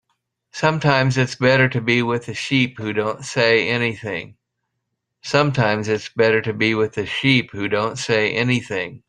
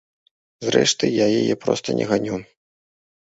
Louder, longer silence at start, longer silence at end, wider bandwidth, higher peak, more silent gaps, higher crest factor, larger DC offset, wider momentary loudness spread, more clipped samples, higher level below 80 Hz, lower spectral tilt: about the same, -19 LUFS vs -20 LUFS; about the same, 0.55 s vs 0.6 s; second, 0.1 s vs 0.9 s; first, 10 kHz vs 8 kHz; about the same, -2 dBFS vs -2 dBFS; neither; about the same, 18 dB vs 20 dB; neither; second, 7 LU vs 11 LU; neither; about the same, -56 dBFS vs -58 dBFS; first, -5.5 dB/octave vs -4 dB/octave